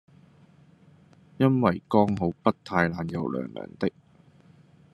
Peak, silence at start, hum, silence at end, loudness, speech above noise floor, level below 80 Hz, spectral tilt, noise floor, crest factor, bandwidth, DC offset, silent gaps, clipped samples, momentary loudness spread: -4 dBFS; 1.4 s; none; 1.05 s; -26 LUFS; 31 dB; -64 dBFS; -8.5 dB/octave; -56 dBFS; 24 dB; 12.5 kHz; under 0.1%; none; under 0.1%; 9 LU